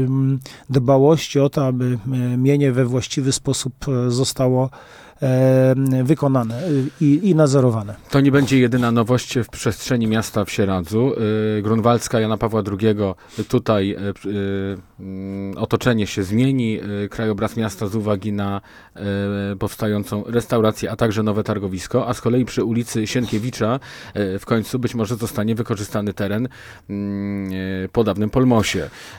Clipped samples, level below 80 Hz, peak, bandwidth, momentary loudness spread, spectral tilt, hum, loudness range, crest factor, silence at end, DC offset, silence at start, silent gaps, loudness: under 0.1%; -48 dBFS; -2 dBFS; 17.5 kHz; 10 LU; -6.5 dB/octave; none; 6 LU; 16 dB; 0 s; under 0.1%; 0 s; none; -20 LUFS